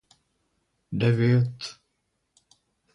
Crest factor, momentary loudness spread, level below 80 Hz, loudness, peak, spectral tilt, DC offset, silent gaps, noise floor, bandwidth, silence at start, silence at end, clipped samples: 18 dB; 17 LU; -60 dBFS; -24 LUFS; -10 dBFS; -7.5 dB/octave; under 0.1%; none; -76 dBFS; 10.5 kHz; 0.9 s; 1.2 s; under 0.1%